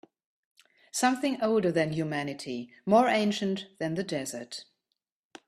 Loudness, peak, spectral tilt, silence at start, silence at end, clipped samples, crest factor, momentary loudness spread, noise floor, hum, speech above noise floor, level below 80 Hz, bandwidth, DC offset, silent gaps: -29 LUFS; -8 dBFS; -4.5 dB/octave; 0.95 s; 0.85 s; under 0.1%; 20 dB; 13 LU; -84 dBFS; none; 56 dB; -70 dBFS; 14 kHz; under 0.1%; none